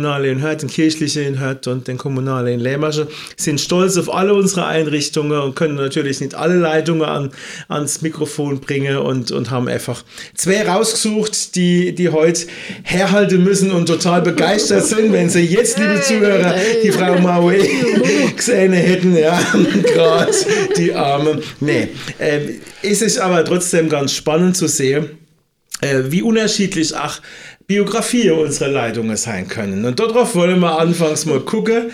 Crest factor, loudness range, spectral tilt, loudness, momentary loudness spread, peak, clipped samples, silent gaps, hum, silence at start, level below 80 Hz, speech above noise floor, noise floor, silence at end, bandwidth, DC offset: 14 dB; 5 LU; -4.5 dB/octave; -15 LUFS; 9 LU; 0 dBFS; under 0.1%; none; none; 0 s; -54 dBFS; 39 dB; -54 dBFS; 0 s; 16 kHz; under 0.1%